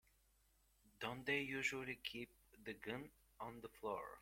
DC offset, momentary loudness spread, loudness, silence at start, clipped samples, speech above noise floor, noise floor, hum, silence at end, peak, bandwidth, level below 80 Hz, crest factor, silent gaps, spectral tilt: under 0.1%; 13 LU; -46 LUFS; 0.85 s; under 0.1%; 30 dB; -77 dBFS; none; 0 s; -28 dBFS; 16.5 kHz; -74 dBFS; 22 dB; none; -4 dB/octave